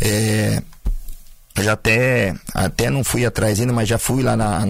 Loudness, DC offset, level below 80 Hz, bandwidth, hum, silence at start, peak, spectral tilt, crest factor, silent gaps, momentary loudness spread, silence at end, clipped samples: -18 LUFS; under 0.1%; -32 dBFS; 16 kHz; none; 0 s; -4 dBFS; -5 dB/octave; 14 dB; none; 12 LU; 0 s; under 0.1%